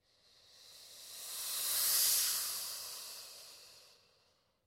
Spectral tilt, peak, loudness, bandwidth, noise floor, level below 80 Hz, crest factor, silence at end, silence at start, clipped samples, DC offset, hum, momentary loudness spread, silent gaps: 3 dB/octave; -18 dBFS; -33 LUFS; 16.5 kHz; -75 dBFS; -82 dBFS; 22 dB; 0.8 s; 0.55 s; under 0.1%; under 0.1%; none; 25 LU; none